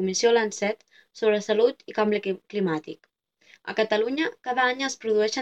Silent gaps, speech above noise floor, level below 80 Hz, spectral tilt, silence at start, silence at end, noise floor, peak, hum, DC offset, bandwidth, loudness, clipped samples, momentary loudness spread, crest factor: none; 34 dB; -76 dBFS; -3.5 dB/octave; 0 s; 0 s; -59 dBFS; -8 dBFS; none; under 0.1%; 8.8 kHz; -25 LUFS; under 0.1%; 10 LU; 16 dB